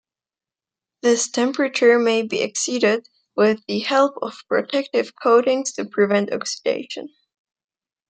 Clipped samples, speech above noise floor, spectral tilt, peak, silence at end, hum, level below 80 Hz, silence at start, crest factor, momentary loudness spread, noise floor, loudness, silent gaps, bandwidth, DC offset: under 0.1%; over 70 dB; -3 dB/octave; -4 dBFS; 1 s; none; -74 dBFS; 1.05 s; 18 dB; 9 LU; under -90 dBFS; -20 LUFS; none; 9.4 kHz; under 0.1%